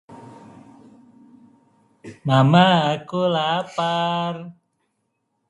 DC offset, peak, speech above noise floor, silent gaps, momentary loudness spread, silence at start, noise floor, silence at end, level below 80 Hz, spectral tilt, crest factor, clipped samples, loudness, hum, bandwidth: under 0.1%; 0 dBFS; 54 dB; none; 16 LU; 0.1 s; -73 dBFS; 1 s; -64 dBFS; -6.5 dB/octave; 22 dB; under 0.1%; -19 LUFS; none; 10.5 kHz